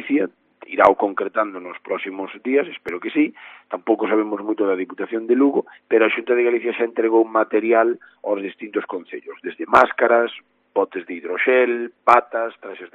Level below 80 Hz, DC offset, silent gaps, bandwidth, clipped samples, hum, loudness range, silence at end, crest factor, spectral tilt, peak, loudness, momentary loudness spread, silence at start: -64 dBFS; under 0.1%; none; 5.2 kHz; under 0.1%; none; 4 LU; 0.1 s; 20 dB; -2.5 dB/octave; 0 dBFS; -20 LUFS; 13 LU; 0 s